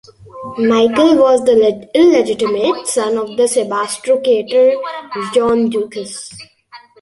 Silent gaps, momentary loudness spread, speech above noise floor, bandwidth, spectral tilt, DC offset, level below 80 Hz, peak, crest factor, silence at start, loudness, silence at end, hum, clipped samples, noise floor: none; 13 LU; 28 dB; 11.5 kHz; -4 dB/octave; under 0.1%; -54 dBFS; -2 dBFS; 14 dB; 0.35 s; -14 LUFS; 0.25 s; none; under 0.1%; -42 dBFS